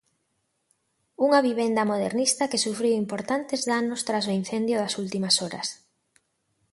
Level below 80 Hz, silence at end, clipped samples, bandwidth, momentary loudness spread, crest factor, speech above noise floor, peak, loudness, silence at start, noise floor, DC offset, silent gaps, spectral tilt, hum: -72 dBFS; 0.95 s; under 0.1%; 11.5 kHz; 7 LU; 20 dB; 50 dB; -8 dBFS; -25 LUFS; 1.2 s; -75 dBFS; under 0.1%; none; -3.5 dB/octave; none